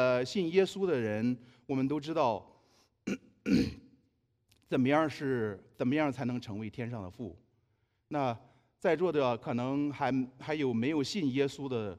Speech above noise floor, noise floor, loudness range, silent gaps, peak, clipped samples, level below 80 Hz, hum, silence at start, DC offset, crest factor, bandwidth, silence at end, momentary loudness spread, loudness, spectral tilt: 44 dB; -75 dBFS; 4 LU; none; -14 dBFS; under 0.1%; -64 dBFS; none; 0 s; under 0.1%; 20 dB; 12 kHz; 0 s; 11 LU; -32 LUFS; -6.5 dB/octave